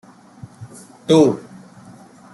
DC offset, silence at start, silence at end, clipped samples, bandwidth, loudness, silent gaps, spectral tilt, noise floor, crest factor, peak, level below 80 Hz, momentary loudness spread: under 0.1%; 0.6 s; 0.95 s; under 0.1%; 12 kHz; -16 LUFS; none; -6.5 dB/octave; -43 dBFS; 18 dB; -2 dBFS; -60 dBFS; 25 LU